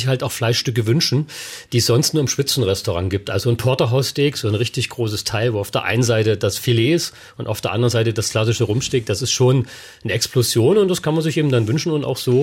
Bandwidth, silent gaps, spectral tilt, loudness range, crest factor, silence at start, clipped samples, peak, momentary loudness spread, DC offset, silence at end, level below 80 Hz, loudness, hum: 16.5 kHz; none; -5 dB/octave; 2 LU; 12 dB; 0 s; under 0.1%; -6 dBFS; 6 LU; under 0.1%; 0 s; -52 dBFS; -18 LUFS; none